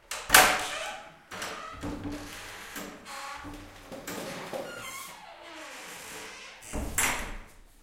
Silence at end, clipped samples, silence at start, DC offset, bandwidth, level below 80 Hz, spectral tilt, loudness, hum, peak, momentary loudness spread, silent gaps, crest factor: 0.15 s; under 0.1%; 0.1 s; under 0.1%; 16.5 kHz; -48 dBFS; -1 dB/octave; -28 LUFS; none; -2 dBFS; 21 LU; none; 32 dB